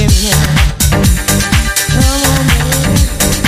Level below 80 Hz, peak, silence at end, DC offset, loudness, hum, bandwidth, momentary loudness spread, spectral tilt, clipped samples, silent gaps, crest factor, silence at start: -14 dBFS; 0 dBFS; 0 s; under 0.1%; -10 LUFS; none; 16 kHz; 2 LU; -4 dB/octave; under 0.1%; none; 10 dB; 0 s